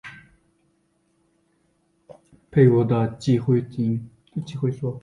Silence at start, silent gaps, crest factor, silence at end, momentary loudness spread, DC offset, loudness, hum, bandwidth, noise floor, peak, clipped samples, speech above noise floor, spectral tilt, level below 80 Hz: 0.05 s; none; 20 dB; 0.05 s; 16 LU; under 0.1%; -22 LUFS; none; 10 kHz; -67 dBFS; -4 dBFS; under 0.1%; 46 dB; -9 dB/octave; -56 dBFS